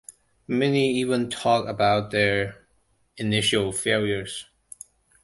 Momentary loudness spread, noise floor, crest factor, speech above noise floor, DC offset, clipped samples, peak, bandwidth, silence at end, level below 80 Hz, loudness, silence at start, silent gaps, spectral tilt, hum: 15 LU; -66 dBFS; 20 dB; 43 dB; under 0.1%; under 0.1%; -6 dBFS; 11.5 kHz; 0.8 s; -54 dBFS; -23 LUFS; 0.1 s; none; -4.5 dB/octave; none